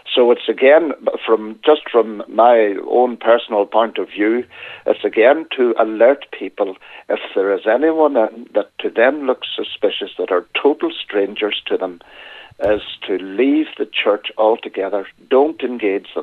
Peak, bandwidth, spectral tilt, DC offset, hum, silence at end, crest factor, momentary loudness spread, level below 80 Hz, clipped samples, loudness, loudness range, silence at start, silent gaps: 0 dBFS; 4.6 kHz; -6.5 dB/octave; under 0.1%; none; 0 s; 16 dB; 10 LU; -58 dBFS; under 0.1%; -17 LUFS; 5 LU; 0.05 s; none